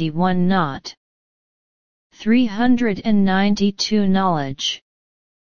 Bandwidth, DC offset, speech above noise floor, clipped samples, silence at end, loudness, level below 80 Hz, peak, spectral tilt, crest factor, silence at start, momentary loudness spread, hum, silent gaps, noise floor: 7.2 kHz; 3%; over 72 dB; under 0.1%; 0.65 s; -19 LUFS; -48 dBFS; -4 dBFS; -5.5 dB/octave; 16 dB; 0 s; 9 LU; none; 0.97-2.10 s; under -90 dBFS